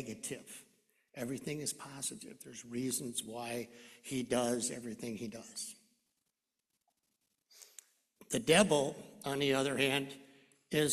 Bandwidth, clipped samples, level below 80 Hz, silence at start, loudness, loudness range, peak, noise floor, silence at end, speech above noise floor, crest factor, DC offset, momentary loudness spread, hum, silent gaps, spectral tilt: 14 kHz; under 0.1%; -70 dBFS; 0 s; -36 LUFS; 12 LU; -12 dBFS; -87 dBFS; 0 s; 51 dB; 26 dB; under 0.1%; 19 LU; none; none; -3.5 dB/octave